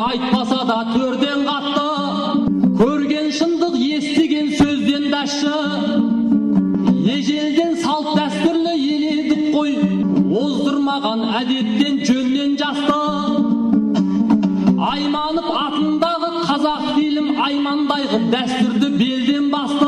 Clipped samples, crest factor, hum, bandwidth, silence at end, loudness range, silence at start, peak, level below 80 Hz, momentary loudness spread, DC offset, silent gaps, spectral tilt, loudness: under 0.1%; 12 dB; none; 10 kHz; 0 s; 1 LU; 0 s; -6 dBFS; -50 dBFS; 3 LU; under 0.1%; none; -5.5 dB/octave; -17 LUFS